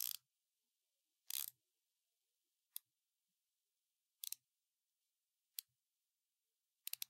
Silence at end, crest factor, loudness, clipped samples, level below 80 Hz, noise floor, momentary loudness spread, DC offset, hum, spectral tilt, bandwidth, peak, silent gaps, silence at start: 0.05 s; 34 dB; -50 LUFS; under 0.1%; under -90 dBFS; under -90 dBFS; 10 LU; under 0.1%; none; 5 dB/octave; 17 kHz; -22 dBFS; none; 0 s